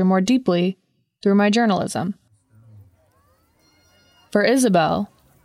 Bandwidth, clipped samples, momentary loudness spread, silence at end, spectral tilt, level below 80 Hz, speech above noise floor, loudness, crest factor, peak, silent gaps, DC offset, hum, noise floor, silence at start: 13.5 kHz; under 0.1%; 13 LU; 0.4 s; -5.5 dB/octave; -60 dBFS; 42 dB; -19 LUFS; 18 dB; -4 dBFS; none; under 0.1%; none; -60 dBFS; 0 s